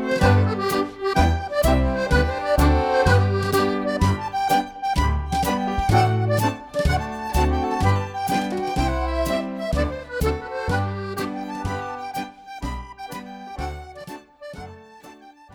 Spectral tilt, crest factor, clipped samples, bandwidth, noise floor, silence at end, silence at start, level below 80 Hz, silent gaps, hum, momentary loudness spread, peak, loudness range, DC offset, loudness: -6 dB/octave; 18 dB; under 0.1%; over 20 kHz; -45 dBFS; 0.25 s; 0 s; -30 dBFS; none; none; 16 LU; -4 dBFS; 12 LU; under 0.1%; -22 LUFS